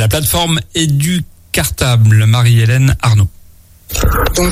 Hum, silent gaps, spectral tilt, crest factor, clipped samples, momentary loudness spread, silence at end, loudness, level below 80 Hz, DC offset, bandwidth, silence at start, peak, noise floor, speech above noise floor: none; none; -5 dB/octave; 10 dB; under 0.1%; 8 LU; 0 s; -12 LUFS; -24 dBFS; under 0.1%; 16 kHz; 0 s; 0 dBFS; -41 dBFS; 30 dB